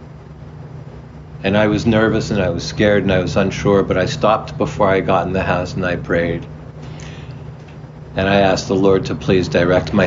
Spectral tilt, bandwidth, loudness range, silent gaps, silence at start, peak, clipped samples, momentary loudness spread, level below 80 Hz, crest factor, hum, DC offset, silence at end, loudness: -6 dB/octave; 7.6 kHz; 4 LU; none; 0 s; -2 dBFS; under 0.1%; 20 LU; -38 dBFS; 16 dB; none; under 0.1%; 0 s; -16 LUFS